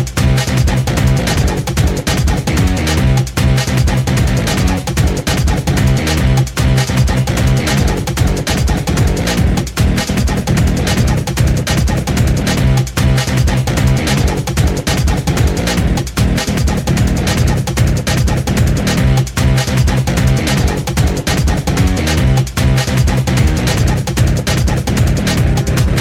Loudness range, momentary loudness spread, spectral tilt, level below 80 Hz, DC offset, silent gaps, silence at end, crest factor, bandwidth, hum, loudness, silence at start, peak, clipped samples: 1 LU; 2 LU; -5.5 dB/octave; -18 dBFS; under 0.1%; none; 0 s; 12 dB; 16.5 kHz; none; -14 LUFS; 0 s; -2 dBFS; under 0.1%